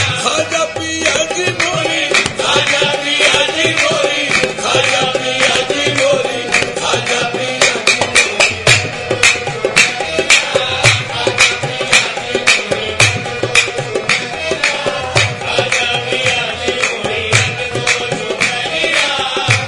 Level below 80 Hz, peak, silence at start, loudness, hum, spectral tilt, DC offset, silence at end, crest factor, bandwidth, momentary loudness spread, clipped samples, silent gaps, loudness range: -46 dBFS; 0 dBFS; 0 s; -12 LUFS; none; -2 dB/octave; under 0.1%; 0 s; 14 dB; 12 kHz; 6 LU; 0.2%; none; 3 LU